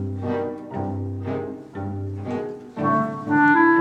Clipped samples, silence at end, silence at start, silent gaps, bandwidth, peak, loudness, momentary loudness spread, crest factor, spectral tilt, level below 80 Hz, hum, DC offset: under 0.1%; 0 s; 0 s; none; 8 kHz; -4 dBFS; -24 LUFS; 15 LU; 18 dB; -9 dB/octave; -64 dBFS; none; under 0.1%